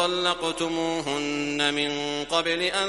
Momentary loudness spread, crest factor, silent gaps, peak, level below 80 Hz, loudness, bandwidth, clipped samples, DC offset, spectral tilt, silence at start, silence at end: 4 LU; 20 dB; none; -6 dBFS; -54 dBFS; -25 LUFS; 11.5 kHz; under 0.1%; under 0.1%; -3 dB/octave; 0 s; 0 s